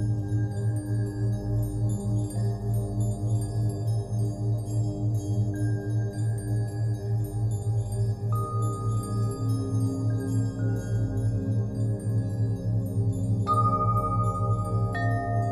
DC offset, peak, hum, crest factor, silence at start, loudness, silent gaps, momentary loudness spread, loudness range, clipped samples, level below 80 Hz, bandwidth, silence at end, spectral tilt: under 0.1%; -12 dBFS; 50 Hz at -40 dBFS; 14 dB; 0 s; -28 LUFS; none; 3 LU; 2 LU; under 0.1%; -42 dBFS; 12.5 kHz; 0 s; -8 dB/octave